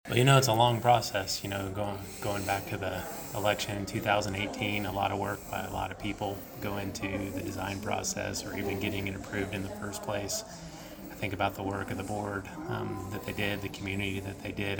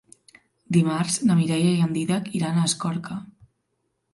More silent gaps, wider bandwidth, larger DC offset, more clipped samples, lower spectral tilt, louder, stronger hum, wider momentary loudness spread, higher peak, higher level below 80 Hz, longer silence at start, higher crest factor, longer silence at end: neither; first, over 20 kHz vs 11.5 kHz; neither; neither; about the same, -4.5 dB/octave vs -5.5 dB/octave; second, -32 LUFS vs -23 LUFS; neither; about the same, 11 LU vs 9 LU; about the same, -8 dBFS vs -6 dBFS; first, -54 dBFS vs -64 dBFS; second, 0.05 s vs 0.7 s; first, 24 dB vs 18 dB; second, 0 s vs 0.85 s